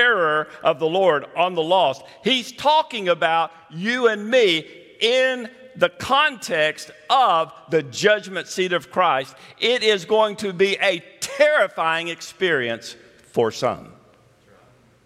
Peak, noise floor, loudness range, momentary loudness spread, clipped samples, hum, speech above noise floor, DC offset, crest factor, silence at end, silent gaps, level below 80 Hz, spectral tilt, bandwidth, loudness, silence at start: -4 dBFS; -54 dBFS; 2 LU; 10 LU; under 0.1%; none; 34 dB; under 0.1%; 18 dB; 1.15 s; none; -66 dBFS; -3.5 dB/octave; 15 kHz; -20 LUFS; 0 s